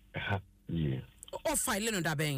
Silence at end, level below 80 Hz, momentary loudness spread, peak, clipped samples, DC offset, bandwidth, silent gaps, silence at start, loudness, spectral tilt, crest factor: 0 s; -54 dBFS; 9 LU; -20 dBFS; under 0.1%; under 0.1%; 15.5 kHz; none; 0.15 s; -34 LUFS; -4 dB/octave; 14 dB